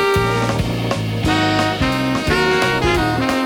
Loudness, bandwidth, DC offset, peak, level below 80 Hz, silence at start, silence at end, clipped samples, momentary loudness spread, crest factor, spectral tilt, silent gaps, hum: -17 LUFS; over 20 kHz; under 0.1%; -4 dBFS; -32 dBFS; 0 s; 0 s; under 0.1%; 5 LU; 14 dB; -5 dB/octave; none; none